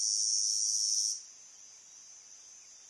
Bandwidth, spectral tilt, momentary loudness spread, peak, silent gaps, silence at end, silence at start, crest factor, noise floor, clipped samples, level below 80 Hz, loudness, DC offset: 11.5 kHz; 6 dB/octave; 23 LU; -18 dBFS; none; 0 s; 0 s; 16 dB; -54 dBFS; under 0.1%; under -90 dBFS; -28 LUFS; under 0.1%